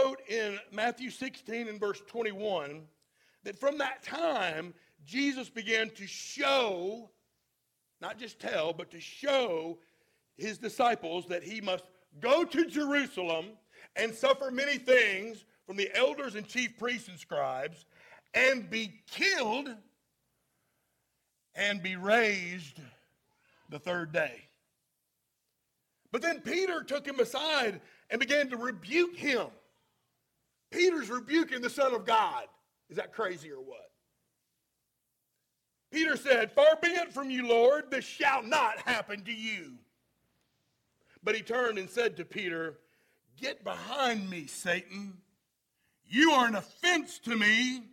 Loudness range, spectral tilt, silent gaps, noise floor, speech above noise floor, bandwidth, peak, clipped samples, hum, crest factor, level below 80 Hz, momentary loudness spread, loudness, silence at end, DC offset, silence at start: 8 LU; -3 dB/octave; none; -82 dBFS; 51 dB; 16.5 kHz; -10 dBFS; under 0.1%; none; 24 dB; -80 dBFS; 15 LU; -30 LUFS; 0.05 s; under 0.1%; 0 s